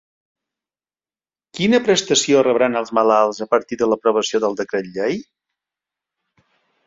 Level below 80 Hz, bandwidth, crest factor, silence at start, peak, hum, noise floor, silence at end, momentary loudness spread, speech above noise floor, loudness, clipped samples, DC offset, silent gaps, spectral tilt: -62 dBFS; 7.8 kHz; 18 dB; 1.55 s; -2 dBFS; none; under -90 dBFS; 1.65 s; 9 LU; over 73 dB; -18 LUFS; under 0.1%; under 0.1%; none; -3.5 dB/octave